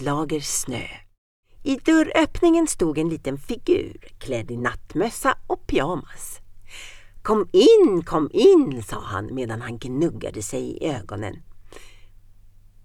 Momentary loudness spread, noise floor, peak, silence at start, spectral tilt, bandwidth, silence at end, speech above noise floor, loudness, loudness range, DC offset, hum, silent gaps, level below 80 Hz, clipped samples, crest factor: 20 LU; -48 dBFS; -4 dBFS; 0 s; -5 dB/octave; 15.5 kHz; 0.95 s; 27 dB; -22 LUFS; 10 LU; under 0.1%; none; 1.18-1.43 s; -42 dBFS; under 0.1%; 18 dB